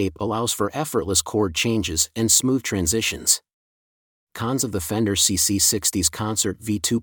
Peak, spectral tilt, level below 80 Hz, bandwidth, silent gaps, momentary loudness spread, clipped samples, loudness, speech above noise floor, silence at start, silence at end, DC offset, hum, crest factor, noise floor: -2 dBFS; -3 dB/octave; -48 dBFS; 19.5 kHz; 3.53-4.27 s; 7 LU; under 0.1%; -20 LUFS; over 68 dB; 0 s; 0 s; under 0.1%; none; 22 dB; under -90 dBFS